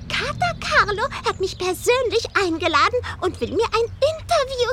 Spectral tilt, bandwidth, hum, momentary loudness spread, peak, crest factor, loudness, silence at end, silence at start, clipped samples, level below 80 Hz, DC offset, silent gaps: -3.5 dB/octave; 16.5 kHz; none; 6 LU; -4 dBFS; 18 dB; -21 LUFS; 0 s; 0 s; under 0.1%; -42 dBFS; under 0.1%; none